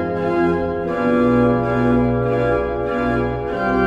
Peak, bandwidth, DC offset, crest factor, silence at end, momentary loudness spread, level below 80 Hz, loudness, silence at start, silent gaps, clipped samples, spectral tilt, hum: -4 dBFS; 7.4 kHz; under 0.1%; 14 dB; 0 s; 6 LU; -36 dBFS; -18 LUFS; 0 s; none; under 0.1%; -9 dB/octave; none